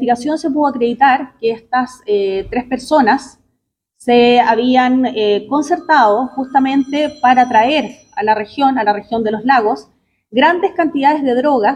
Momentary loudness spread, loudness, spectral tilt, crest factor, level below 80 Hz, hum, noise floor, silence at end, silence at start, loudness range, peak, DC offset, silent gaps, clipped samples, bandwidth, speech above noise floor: 8 LU; -14 LUFS; -4.5 dB/octave; 14 dB; -52 dBFS; none; -70 dBFS; 0 s; 0 s; 3 LU; 0 dBFS; under 0.1%; none; under 0.1%; 11 kHz; 56 dB